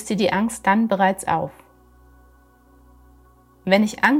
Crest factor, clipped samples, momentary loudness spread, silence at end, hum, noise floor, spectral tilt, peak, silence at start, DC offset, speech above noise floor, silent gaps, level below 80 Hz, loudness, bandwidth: 22 dB; under 0.1%; 8 LU; 0 s; none; -53 dBFS; -5 dB/octave; 0 dBFS; 0 s; under 0.1%; 34 dB; none; -54 dBFS; -20 LUFS; 16 kHz